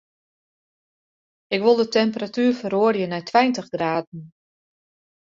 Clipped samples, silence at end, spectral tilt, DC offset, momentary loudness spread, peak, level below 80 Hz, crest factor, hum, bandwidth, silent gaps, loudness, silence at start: under 0.1%; 1.05 s; -5.5 dB/octave; under 0.1%; 9 LU; -2 dBFS; -68 dBFS; 20 dB; none; 7.6 kHz; 4.07-4.12 s; -21 LUFS; 1.5 s